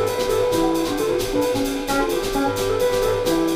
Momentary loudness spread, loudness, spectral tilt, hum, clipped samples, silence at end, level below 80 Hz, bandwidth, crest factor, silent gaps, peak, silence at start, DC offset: 2 LU; -21 LUFS; -4.5 dB/octave; none; under 0.1%; 0 s; -36 dBFS; 16 kHz; 12 dB; none; -8 dBFS; 0 s; under 0.1%